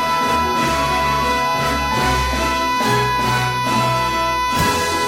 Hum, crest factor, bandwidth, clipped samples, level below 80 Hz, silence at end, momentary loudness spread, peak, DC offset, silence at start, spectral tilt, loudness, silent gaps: none; 12 dB; 16.5 kHz; under 0.1%; -32 dBFS; 0 s; 1 LU; -6 dBFS; under 0.1%; 0 s; -3.5 dB/octave; -17 LUFS; none